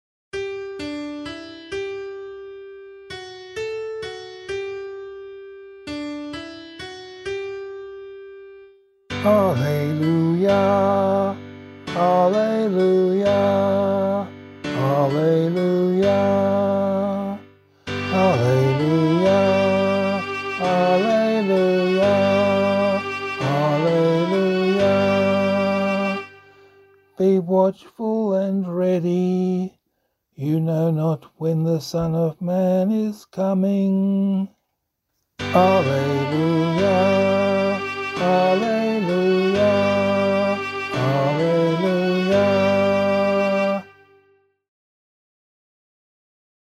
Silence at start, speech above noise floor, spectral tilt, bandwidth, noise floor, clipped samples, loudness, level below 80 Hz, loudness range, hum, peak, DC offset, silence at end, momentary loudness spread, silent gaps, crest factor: 0.35 s; 57 dB; -7 dB/octave; 12.5 kHz; -76 dBFS; under 0.1%; -20 LUFS; -58 dBFS; 13 LU; none; -4 dBFS; under 0.1%; 2.85 s; 16 LU; none; 18 dB